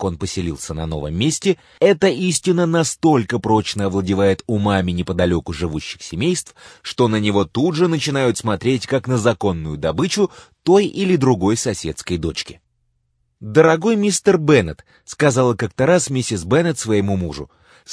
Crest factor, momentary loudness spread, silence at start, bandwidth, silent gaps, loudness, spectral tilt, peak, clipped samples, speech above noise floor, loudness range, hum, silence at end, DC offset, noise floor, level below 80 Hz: 18 dB; 10 LU; 0 s; 11 kHz; none; -18 LUFS; -5 dB/octave; 0 dBFS; under 0.1%; 49 dB; 3 LU; none; 0 s; under 0.1%; -67 dBFS; -42 dBFS